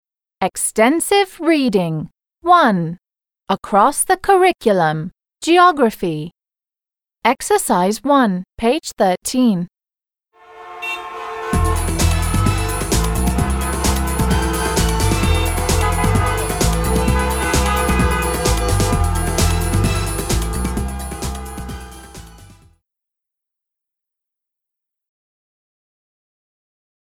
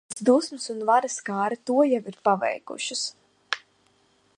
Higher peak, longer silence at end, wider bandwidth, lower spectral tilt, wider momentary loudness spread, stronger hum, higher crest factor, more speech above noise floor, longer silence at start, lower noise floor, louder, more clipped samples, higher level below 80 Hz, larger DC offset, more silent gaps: about the same, -2 dBFS vs -4 dBFS; first, 4.65 s vs 0.8 s; first, over 20 kHz vs 11 kHz; first, -5 dB/octave vs -3.5 dB/octave; about the same, 13 LU vs 11 LU; neither; about the same, 16 dB vs 20 dB; first, over 75 dB vs 40 dB; first, 0.4 s vs 0.1 s; first, under -90 dBFS vs -64 dBFS; first, -17 LUFS vs -25 LUFS; neither; first, -26 dBFS vs -78 dBFS; neither; neither